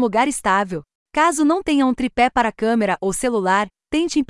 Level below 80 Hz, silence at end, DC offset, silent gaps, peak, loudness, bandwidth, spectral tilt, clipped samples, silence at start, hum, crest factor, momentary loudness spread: -46 dBFS; 0.05 s; under 0.1%; 0.95-1.06 s; -6 dBFS; -19 LUFS; 12 kHz; -4 dB/octave; under 0.1%; 0 s; none; 14 dB; 6 LU